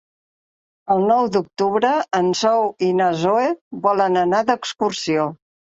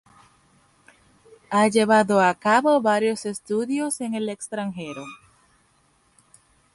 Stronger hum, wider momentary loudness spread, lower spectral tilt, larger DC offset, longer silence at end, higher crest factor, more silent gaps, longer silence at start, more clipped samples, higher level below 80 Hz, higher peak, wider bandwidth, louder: neither; second, 5 LU vs 14 LU; about the same, -5 dB/octave vs -4.5 dB/octave; neither; second, 0.4 s vs 1.6 s; about the same, 16 dB vs 20 dB; first, 3.61-3.71 s vs none; second, 0.85 s vs 1.5 s; neither; about the same, -64 dBFS vs -68 dBFS; about the same, -2 dBFS vs -4 dBFS; second, 8 kHz vs 12 kHz; first, -19 LUFS vs -22 LUFS